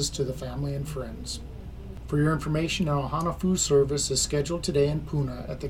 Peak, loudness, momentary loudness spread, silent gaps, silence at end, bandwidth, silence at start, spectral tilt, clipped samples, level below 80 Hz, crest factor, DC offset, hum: -12 dBFS; -27 LUFS; 13 LU; none; 0 s; 16 kHz; 0 s; -5 dB/octave; under 0.1%; -40 dBFS; 16 dB; under 0.1%; none